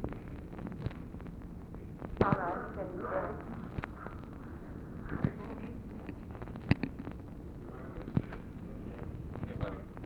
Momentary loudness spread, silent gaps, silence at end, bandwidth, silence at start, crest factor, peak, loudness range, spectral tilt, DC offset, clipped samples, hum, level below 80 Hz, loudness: 13 LU; none; 0 s; 19.5 kHz; 0 s; 28 dB; -12 dBFS; 4 LU; -9 dB/octave; under 0.1%; under 0.1%; none; -50 dBFS; -40 LUFS